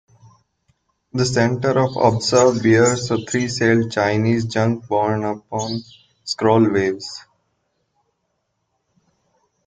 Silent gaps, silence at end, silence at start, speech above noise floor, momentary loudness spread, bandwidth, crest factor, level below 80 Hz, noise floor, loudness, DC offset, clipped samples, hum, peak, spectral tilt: none; 2.45 s; 1.15 s; 54 dB; 13 LU; 9.6 kHz; 18 dB; -56 dBFS; -72 dBFS; -18 LUFS; under 0.1%; under 0.1%; none; -2 dBFS; -5.5 dB/octave